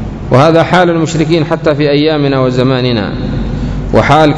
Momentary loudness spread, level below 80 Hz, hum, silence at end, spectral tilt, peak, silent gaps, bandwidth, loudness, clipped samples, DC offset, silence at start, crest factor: 10 LU; -26 dBFS; none; 0 s; -6.5 dB/octave; 0 dBFS; none; 11 kHz; -10 LUFS; 2%; under 0.1%; 0 s; 10 dB